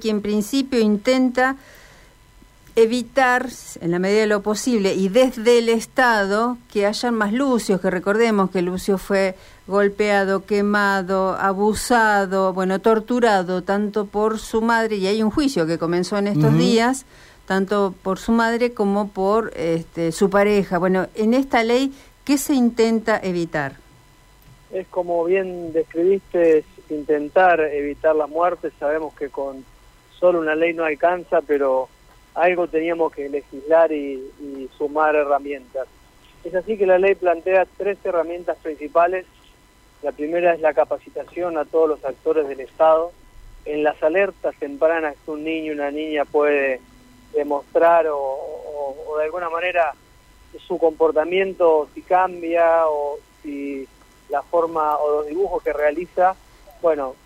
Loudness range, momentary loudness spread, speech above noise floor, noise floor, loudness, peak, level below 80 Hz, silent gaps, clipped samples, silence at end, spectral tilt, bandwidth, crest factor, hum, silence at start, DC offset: 4 LU; 12 LU; 33 dB; -52 dBFS; -20 LUFS; -6 dBFS; -50 dBFS; none; under 0.1%; 0.1 s; -5.5 dB/octave; 16 kHz; 14 dB; none; 0 s; under 0.1%